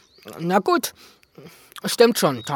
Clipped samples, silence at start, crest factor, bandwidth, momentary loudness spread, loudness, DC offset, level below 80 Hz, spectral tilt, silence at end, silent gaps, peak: under 0.1%; 0.25 s; 22 dB; 19 kHz; 18 LU; -21 LUFS; under 0.1%; -68 dBFS; -4 dB/octave; 0 s; none; -2 dBFS